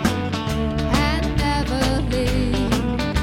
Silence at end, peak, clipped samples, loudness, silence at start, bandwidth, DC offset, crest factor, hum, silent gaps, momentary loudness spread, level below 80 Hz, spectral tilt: 0 s; -2 dBFS; under 0.1%; -21 LUFS; 0 s; 16.5 kHz; under 0.1%; 18 dB; none; none; 3 LU; -26 dBFS; -5.5 dB/octave